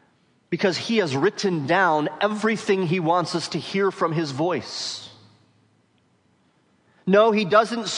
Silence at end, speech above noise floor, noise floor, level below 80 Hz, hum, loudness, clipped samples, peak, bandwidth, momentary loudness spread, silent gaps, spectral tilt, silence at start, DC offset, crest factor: 0 s; 42 dB; -63 dBFS; -72 dBFS; none; -22 LUFS; under 0.1%; -4 dBFS; 10.5 kHz; 10 LU; none; -5 dB/octave; 0.5 s; under 0.1%; 18 dB